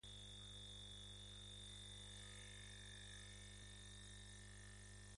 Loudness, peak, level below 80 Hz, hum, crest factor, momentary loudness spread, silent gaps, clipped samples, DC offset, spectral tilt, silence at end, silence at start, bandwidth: -57 LUFS; -46 dBFS; -64 dBFS; 50 Hz at -60 dBFS; 12 dB; 4 LU; none; under 0.1%; under 0.1%; -2.5 dB/octave; 0 s; 0.05 s; 11.5 kHz